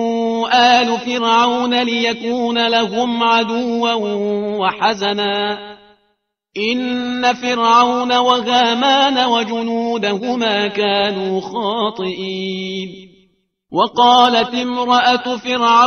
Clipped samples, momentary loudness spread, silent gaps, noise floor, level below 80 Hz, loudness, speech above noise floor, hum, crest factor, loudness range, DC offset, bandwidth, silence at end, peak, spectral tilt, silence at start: under 0.1%; 10 LU; none; -67 dBFS; -60 dBFS; -15 LUFS; 51 dB; none; 16 dB; 5 LU; under 0.1%; 6.6 kHz; 0 s; 0 dBFS; -3.5 dB/octave; 0 s